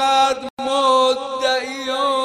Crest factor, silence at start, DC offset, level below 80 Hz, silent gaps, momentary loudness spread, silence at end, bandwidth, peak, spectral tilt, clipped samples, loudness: 14 dB; 0 s; under 0.1%; -62 dBFS; 0.50-0.57 s; 7 LU; 0 s; 14.5 kHz; -4 dBFS; -1 dB/octave; under 0.1%; -18 LUFS